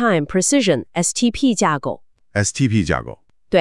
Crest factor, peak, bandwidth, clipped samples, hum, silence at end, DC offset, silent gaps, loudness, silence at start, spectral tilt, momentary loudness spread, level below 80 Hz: 16 dB; -2 dBFS; 12 kHz; under 0.1%; none; 0 s; 0.5%; none; -18 LUFS; 0 s; -4.5 dB/octave; 9 LU; -44 dBFS